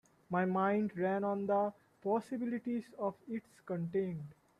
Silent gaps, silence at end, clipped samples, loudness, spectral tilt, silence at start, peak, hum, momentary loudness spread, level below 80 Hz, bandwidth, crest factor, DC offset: none; 0.25 s; under 0.1%; -37 LUFS; -9 dB/octave; 0.3 s; -22 dBFS; none; 11 LU; -78 dBFS; 11.5 kHz; 16 dB; under 0.1%